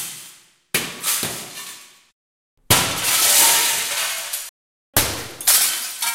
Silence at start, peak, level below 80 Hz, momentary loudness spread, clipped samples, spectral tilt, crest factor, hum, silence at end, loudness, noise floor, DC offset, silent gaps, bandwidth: 0 s; 0 dBFS; -46 dBFS; 19 LU; under 0.1%; -0.5 dB/octave; 22 dB; none; 0 s; -17 LUFS; -47 dBFS; under 0.1%; 2.12-2.57 s, 4.49-4.93 s; 16.5 kHz